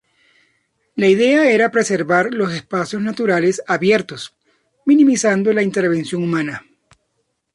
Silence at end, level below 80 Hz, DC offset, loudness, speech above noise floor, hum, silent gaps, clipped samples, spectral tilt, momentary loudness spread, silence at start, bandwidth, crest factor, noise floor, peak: 0.95 s; -62 dBFS; under 0.1%; -16 LUFS; 54 dB; none; none; under 0.1%; -5 dB/octave; 12 LU; 0.95 s; 11.5 kHz; 14 dB; -70 dBFS; -2 dBFS